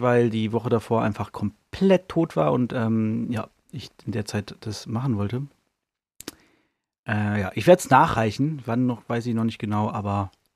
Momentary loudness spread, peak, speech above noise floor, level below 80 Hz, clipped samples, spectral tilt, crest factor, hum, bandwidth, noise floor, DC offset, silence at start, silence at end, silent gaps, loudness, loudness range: 17 LU; -2 dBFS; 60 dB; -56 dBFS; under 0.1%; -7 dB/octave; 22 dB; none; 15 kHz; -83 dBFS; under 0.1%; 0 s; 0.3 s; 6.99-7.03 s; -24 LUFS; 9 LU